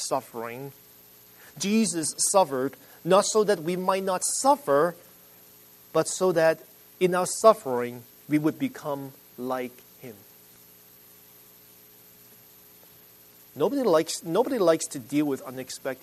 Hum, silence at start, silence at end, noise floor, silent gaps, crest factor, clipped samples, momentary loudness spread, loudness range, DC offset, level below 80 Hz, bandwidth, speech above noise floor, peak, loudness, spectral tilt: 60 Hz at -60 dBFS; 0 s; 0.1 s; -53 dBFS; none; 22 dB; under 0.1%; 16 LU; 13 LU; under 0.1%; -74 dBFS; 13.5 kHz; 28 dB; -4 dBFS; -25 LUFS; -4 dB/octave